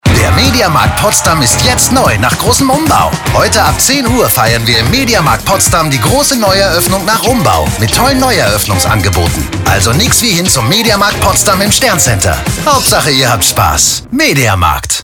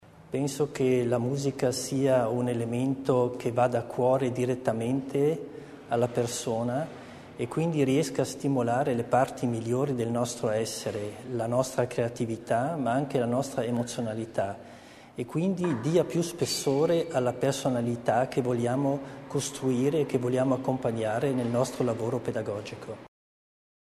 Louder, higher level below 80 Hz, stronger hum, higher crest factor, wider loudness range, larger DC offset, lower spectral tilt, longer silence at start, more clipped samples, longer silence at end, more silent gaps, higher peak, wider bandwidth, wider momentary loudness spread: first, -8 LUFS vs -28 LUFS; first, -26 dBFS vs -62 dBFS; neither; second, 8 dB vs 18 dB; about the same, 1 LU vs 3 LU; neither; second, -3 dB/octave vs -6 dB/octave; about the same, 0.05 s vs 0.15 s; first, 0.2% vs under 0.1%; second, 0 s vs 0.8 s; neither; first, 0 dBFS vs -10 dBFS; first, 19.5 kHz vs 13.5 kHz; second, 3 LU vs 9 LU